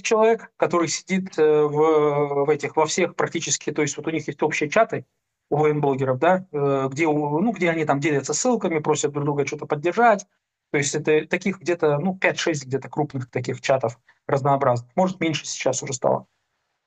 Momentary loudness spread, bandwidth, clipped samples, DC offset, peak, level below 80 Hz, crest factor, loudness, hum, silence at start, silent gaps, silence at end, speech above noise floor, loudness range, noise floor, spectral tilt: 8 LU; 9 kHz; under 0.1%; under 0.1%; -2 dBFS; -66 dBFS; 20 dB; -22 LUFS; none; 0.05 s; none; 0.65 s; 53 dB; 2 LU; -74 dBFS; -4.5 dB/octave